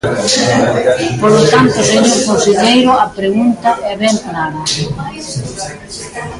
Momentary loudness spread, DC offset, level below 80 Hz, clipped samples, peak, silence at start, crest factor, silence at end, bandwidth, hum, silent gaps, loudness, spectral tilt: 14 LU; under 0.1%; -42 dBFS; under 0.1%; 0 dBFS; 0.05 s; 12 dB; 0 s; 11.5 kHz; none; none; -11 LUFS; -4 dB/octave